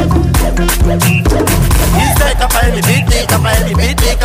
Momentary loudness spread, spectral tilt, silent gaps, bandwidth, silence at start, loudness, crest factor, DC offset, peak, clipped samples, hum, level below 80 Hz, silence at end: 2 LU; -4.5 dB/octave; none; 16 kHz; 0 s; -11 LUFS; 10 dB; under 0.1%; 0 dBFS; under 0.1%; none; -14 dBFS; 0 s